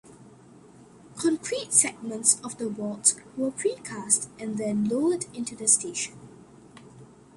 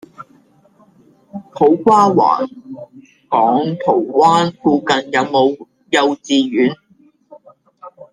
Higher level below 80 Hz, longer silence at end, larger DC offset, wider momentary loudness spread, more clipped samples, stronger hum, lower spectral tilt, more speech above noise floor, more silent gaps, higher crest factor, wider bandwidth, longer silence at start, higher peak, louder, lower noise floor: second, -68 dBFS vs -60 dBFS; first, 0.3 s vs 0.1 s; neither; second, 12 LU vs 22 LU; neither; neither; second, -2.5 dB/octave vs -5.5 dB/octave; second, 25 dB vs 38 dB; neither; first, 26 dB vs 16 dB; first, 12 kHz vs 10 kHz; second, 0.05 s vs 0.2 s; about the same, -2 dBFS vs -2 dBFS; second, -25 LUFS vs -14 LUFS; about the same, -51 dBFS vs -52 dBFS